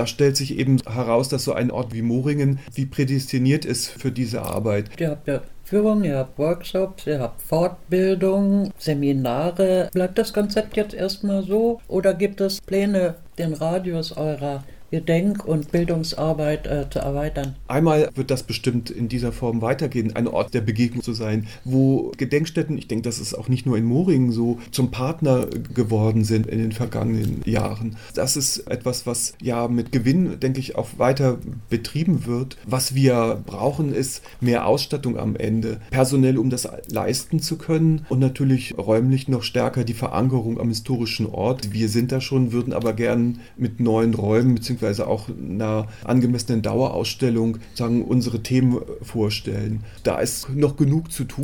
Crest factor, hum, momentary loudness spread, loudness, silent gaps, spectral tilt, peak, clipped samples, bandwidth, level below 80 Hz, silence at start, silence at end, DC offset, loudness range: 18 dB; none; 7 LU; -22 LUFS; none; -6 dB/octave; -4 dBFS; under 0.1%; 18 kHz; -44 dBFS; 0 s; 0 s; 0.5%; 2 LU